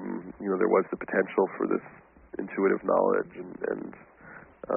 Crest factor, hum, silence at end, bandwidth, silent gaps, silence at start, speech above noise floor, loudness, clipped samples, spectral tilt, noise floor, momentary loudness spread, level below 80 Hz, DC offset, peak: 20 dB; none; 0 s; 3.2 kHz; none; 0 s; 22 dB; -28 LUFS; under 0.1%; -2 dB/octave; -50 dBFS; 19 LU; -66 dBFS; under 0.1%; -10 dBFS